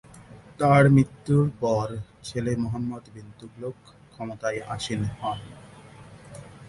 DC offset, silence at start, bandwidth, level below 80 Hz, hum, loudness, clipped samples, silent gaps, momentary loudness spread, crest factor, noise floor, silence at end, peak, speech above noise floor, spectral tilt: under 0.1%; 0.15 s; 11.5 kHz; -52 dBFS; none; -24 LUFS; under 0.1%; none; 26 LU; 20 dB; -47 dBFS; 0 s; -6 dBFS; 23 dB; -7 dB/octave